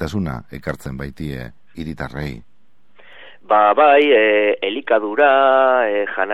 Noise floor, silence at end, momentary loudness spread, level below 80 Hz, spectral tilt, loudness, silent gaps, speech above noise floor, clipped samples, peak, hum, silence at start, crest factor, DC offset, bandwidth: -57 dBFS; 0 s; 18 LU; -44 dBFS; -6.5 dB/octave; -15 LUFS; none; 41 dB; under 0.1%; 0 dBFS; none; 0 s; 16 dB; 0.9%; 13 kHz